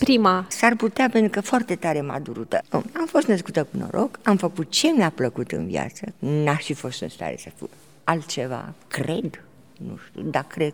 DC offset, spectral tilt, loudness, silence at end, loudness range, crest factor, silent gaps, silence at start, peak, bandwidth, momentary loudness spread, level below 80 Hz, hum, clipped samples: 0.2%; -5 dB/octave; -23 LUFS; 0 s; 7 LU; 22 dB; none; 0 s; -2 dBFS; over 20 kHz; 14 LU; -60 dBFS; none; under 0.1%